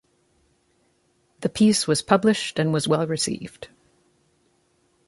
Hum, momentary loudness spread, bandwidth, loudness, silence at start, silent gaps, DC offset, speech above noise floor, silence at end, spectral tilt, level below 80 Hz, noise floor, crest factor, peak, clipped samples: none; 17 LU; 11.5 kHz; -22 LUFS; 1.4 s; none; under 0.1%; 44 dB; 1.4 s; -4.5 dB/octave; -60 dBFS; -66 dBFS; 22 dB; -2 dBFS; under 0.1%